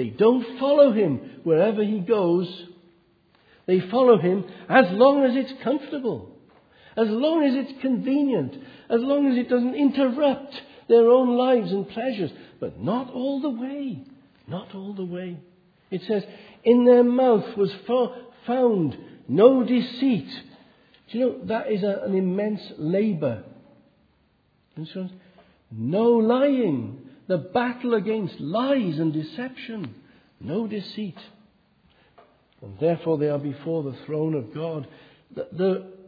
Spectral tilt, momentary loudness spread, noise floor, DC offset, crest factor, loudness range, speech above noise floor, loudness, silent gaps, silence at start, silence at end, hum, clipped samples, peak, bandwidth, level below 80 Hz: -9.5 dB/octave; 18 LU; -65 dBFS; under 0.1%; 20 dB; 10 LU; 42 dB; -23 LUFS; none; 0 s; 0.1 s; none; under 0.1%; -2 dBFS; 5 kHz; -70 dBFS